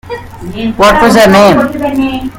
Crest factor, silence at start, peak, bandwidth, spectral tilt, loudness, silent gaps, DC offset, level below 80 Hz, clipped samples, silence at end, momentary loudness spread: 8 dB; 0.05 s; 0 dBFS; 18.5 kHz; -5 dB/octave; -7 LUFS; none; under 0.1%; -30 dBFS; 2%; 0 s; 19 LU